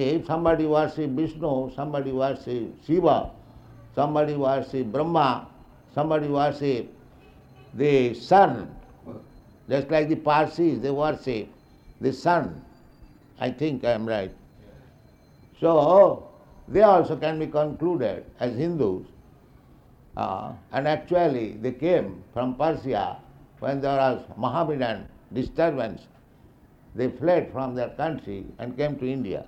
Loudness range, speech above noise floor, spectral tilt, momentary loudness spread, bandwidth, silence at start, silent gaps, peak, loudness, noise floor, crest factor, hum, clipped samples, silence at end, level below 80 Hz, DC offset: 7 LU; 30 dB; -8 dB/octave; 14 LU; 8.6 kHz; 0 s; none; -4 dBFS; -24 LUFS; -54 dBFS; 20 dB; none; under 0.1%; 0 s; -52 dBFS; under 0.1%